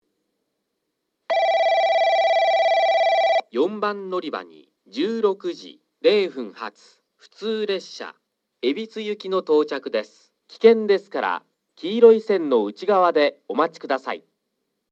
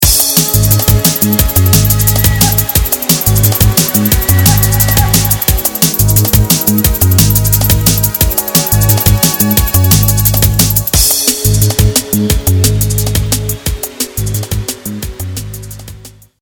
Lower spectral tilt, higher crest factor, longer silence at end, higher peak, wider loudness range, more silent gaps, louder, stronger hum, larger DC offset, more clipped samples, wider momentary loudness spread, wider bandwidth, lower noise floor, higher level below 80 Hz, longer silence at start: about the same, -5 dB/octave vs -4 dB/octave; first, 20 dB vs 10 dB; first, 0.75 s vs 0.3 s; about the same, -2 dBFS vs 0 dBFS; about the same, 7 LU vs 5 LU; neither; second, -21 LUFS vs -9 LUFS; neither; neither; second, under 0.1% vs 0.6%; first, 15 LU vs 9 LU; second, 7.6 kHz vs over 20 kHz; first, -77 dBFS vs -34 dBFS; second, -86 dBFS vs -20 dBFS; first, 1.3 s vs 0 s